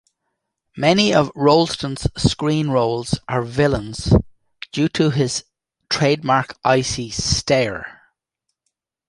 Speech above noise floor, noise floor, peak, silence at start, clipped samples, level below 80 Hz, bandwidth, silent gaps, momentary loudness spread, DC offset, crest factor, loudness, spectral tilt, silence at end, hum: 60 dB; -78 dBFS; -2 dBFS; 0.75 s; under 0.1%; -36 dBFS; 11.5 kHz; none; 9 LU; under 0.1%; 18 dB; -19 LUFS; -5 dB/octave; 1.15 s; none